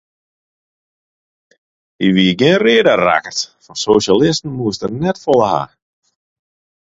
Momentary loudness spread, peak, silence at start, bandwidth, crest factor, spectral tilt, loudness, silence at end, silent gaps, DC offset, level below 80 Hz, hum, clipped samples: 11 LU; 0 dBFS; 2 s; 7.8 kHz; 16 dB; -5 dB/octave; -14 LUFS; 1.2 s; none; under 0.1%; -50 dBFS; none; under 0.1%